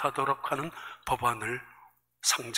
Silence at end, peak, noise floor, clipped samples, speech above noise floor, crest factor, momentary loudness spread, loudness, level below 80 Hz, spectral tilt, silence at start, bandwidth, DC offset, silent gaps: 0 s; -10 dBFS; -60 dBFS; under 0.1%; 29 dB; 22 dB; 11 LU; -31 LUFS; -60 dBFS; -2 dB/octave; 0 s; 16 kHz; under 0.1%; none